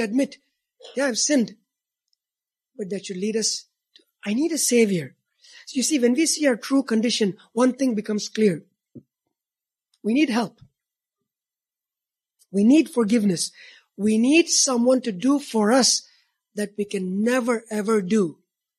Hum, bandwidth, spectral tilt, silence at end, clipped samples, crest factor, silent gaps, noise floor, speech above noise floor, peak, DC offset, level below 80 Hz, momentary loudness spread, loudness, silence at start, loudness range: none; 14 kHz; -3.5 dB/octave; 0.45 s; under 0.1%; 18 dB; none; under -90 dBFS; over 69 dB; -6 dBFS; under 0.1%; -74 dBFS; 13 LU; -22 LUFS; 0 s; 8 LU